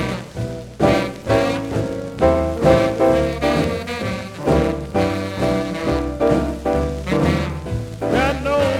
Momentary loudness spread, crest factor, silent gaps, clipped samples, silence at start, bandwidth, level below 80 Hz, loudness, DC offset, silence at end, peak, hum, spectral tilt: 9 LU; 18 dB; none; under 0.1%; 0 s; 16.5 kHz; -32 dBFS; -19 LUFS; under 0.1%; 0 s; -2 dBFS; none; -6.5 dB/octave